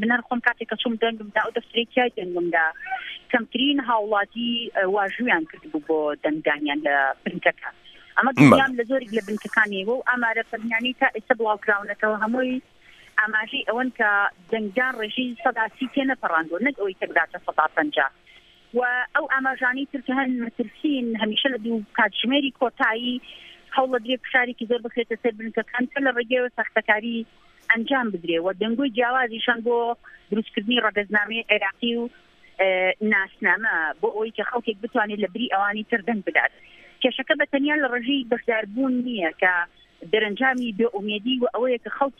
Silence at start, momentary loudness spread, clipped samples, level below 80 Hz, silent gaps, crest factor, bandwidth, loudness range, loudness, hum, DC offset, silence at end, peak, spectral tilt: 0 s; 6 LU; under 0.1%; -64 dBFS; none; 24 dB; 12 kHz; 4 LU; -23 LUFS; none; under 0.1%; 0.1 s; 0 dBFS; -5.5 dB/octave